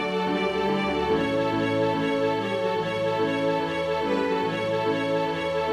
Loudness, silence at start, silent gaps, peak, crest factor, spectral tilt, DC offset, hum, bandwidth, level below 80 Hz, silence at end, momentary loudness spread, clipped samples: -25 LUFS; 0 s; none; -12 dBFS; 12 dB; -6 dB/octave; under 0.1%; none; 14 kHz; -52 dBFS; 0 s; 2 LU; under 0.1%